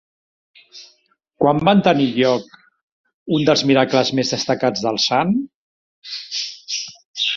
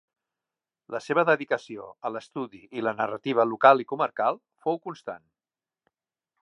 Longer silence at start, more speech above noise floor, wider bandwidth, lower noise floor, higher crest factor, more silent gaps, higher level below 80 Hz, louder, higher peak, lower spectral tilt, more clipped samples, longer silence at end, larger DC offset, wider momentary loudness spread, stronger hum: second, 0.75 s vs 0.9 s; second, 44 dB vs over 64 dB; second, 7.6 kHz vs 10.5 kHz; second, -61 dBFS vs under -90 dBFS; second, 18 dB vs 24 dB; first, 2.83-3.04 s, 3.14-3.26 s, 5.55-6.02 s, 7.05-7.14 s vs none; first, -58 dBFS vs -80 dBFS; first, -18 LUFS vs -25 LUFS; about the same, -2 dBFS vs -4 dBFS; second, -4.5 dB/octave vs -6 dB/octave; neither; second, 0 s vs 1.25 s; neither; second, 11 LU vs 18 LU; neither